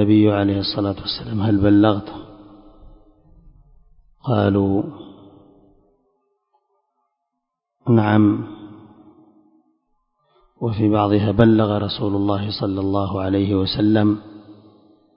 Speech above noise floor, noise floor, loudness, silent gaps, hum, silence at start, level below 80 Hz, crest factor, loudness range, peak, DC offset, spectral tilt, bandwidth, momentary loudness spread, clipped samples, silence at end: 61 dB; -79 dBFS; -19 LUFS; none; none; 0 s; -44 dBFS; 20 dB; 6 LU; 0 dBFS; under 0.1%; -11 dB/octave; 5.4 kHz; 13 LU; under 0.1%; 0.65 s